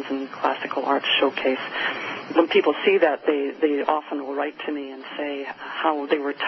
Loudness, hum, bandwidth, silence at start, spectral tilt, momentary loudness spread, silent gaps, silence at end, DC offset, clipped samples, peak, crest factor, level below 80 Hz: -23 LUFS; none; 6 kHz; 0 s; -0.5 dB/octave; 11 LU; none; 0 s; under 0.1%; under 0.1%; -4 dBFS; 18 dB; -70 dBFS